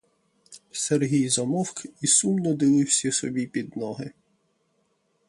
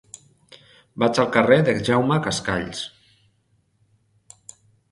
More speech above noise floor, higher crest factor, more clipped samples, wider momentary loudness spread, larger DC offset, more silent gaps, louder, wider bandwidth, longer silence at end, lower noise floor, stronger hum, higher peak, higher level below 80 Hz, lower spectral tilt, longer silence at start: about the same, 46 dB vs 46 dB; about the same, 18 dB vs 22 dB; neither; second, 13 LU vs 23 LU; neither; neither; second, -24 LUFS vs -20 LUFS; about the same, 11.5 kHz vs 11.5 kHz; second, 1.2 s vs 2.05 s; first, -70 dBFS vs -65 dBFS; neither; second, -8 dBFS vs 0 dBFS; second, -68 dBFS vs -54 dBFS; second, -4 dB/octave vs -5.5 dB/octave; second, 0.5 s vs 0.95 s